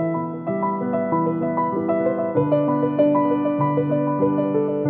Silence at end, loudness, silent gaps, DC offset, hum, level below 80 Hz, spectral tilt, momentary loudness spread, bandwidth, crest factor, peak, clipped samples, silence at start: 0 s; -21 LUFS; none; under 0.1%; none; -68 dBFS; -13 dB/octave; 5 LU; 3.5 kHz; 16 dB; -6 dBFS; under 0.1%; 0 s